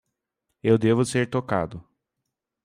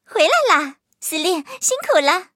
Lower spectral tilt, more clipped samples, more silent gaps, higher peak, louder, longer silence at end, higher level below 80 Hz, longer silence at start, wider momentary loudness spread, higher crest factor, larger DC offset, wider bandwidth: first, -6.5 dB/octave vs 0.5 dB/octave; neither; neither; second, -6 dBFS vs -2 dBFS; second, -23 LUFS vs -17 LUFS; first, 0.85 s vs 0.1 s; first, -58 dBFS vs -82 dBFS; first, 0.65 s vs 0.1 s; about the same, 12 LU vs 10 LU; about the same, 18 dB vs 18 dB; neither; second, 15 kHz vs 17 kHz